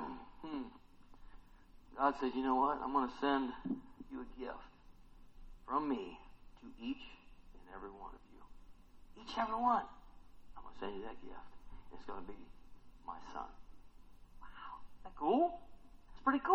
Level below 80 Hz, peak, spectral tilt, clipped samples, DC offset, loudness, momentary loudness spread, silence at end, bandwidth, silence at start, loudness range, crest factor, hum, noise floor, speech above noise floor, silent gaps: -60 dBFS; -16 dBFS; -6 dB/octave; under 0.1%; under 0.1%; -39 LUFS; 24 LU; 0 s; 7.8 kHz; 0 s; 15 LU; 26 dB; none; -60 dBFS; 22 dB; none